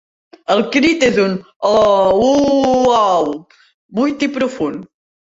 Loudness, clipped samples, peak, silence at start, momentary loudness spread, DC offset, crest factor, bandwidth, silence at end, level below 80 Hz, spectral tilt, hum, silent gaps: -14 LUFS; under 0.1%; -2 dBFS; 0.5 s; 11 LU; under 0.1%; 14 dB; 8 kHz; 0.45 s; -48 dBFS; -5 dB/octave; none; 1.56-1.60 s, 3.74-3.89 s